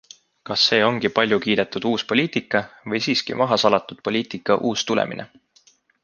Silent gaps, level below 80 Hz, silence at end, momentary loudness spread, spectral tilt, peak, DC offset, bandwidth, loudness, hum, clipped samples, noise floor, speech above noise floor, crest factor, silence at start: none; -62 dBFS; 0.8 s; 8 LU; -4 dB/octave; -2 dBFS; under 0.1%; 9.8 kHz; -21 LUFS; none; under 0.1%; -58 dBFS; 37 dB; 20 dB; 0.45 s